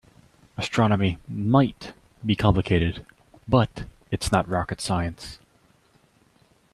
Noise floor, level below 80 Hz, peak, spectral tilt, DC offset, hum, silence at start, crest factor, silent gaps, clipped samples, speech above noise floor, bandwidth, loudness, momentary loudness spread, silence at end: -61 dBFS; -44 dBFS; -4 dBFS; -6.5 dB/octave; under 0.1%; none; 0.6 s; 22 dB; none; under 0.1%; 38 dB; 13 kHz; -24 LUFS; 19 LU; 1.4 s